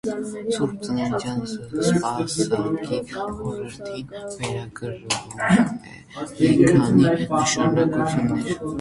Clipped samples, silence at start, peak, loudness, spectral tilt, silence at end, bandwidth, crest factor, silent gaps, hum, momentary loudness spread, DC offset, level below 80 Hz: under 0.1%; 0.05 s; -2 dBFS; -22 LUFS; -5.5 dB/octave; 0 s; 11.5 kHz; 20 dB; none; none; 16 LU; under 0.1%; -50 dBFS